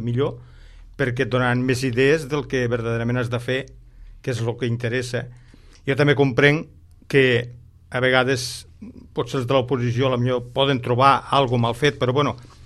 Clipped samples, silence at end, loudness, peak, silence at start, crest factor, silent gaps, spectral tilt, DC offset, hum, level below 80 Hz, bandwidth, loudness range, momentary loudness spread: under 0.1%; 0 s; -21 LUFS; -2 dBFS; 0 s; 20 dB; none; -6 dB/octave; under 0.1%; none; -48 dBFS; 12.5 kHz; 5 LU; 12 LU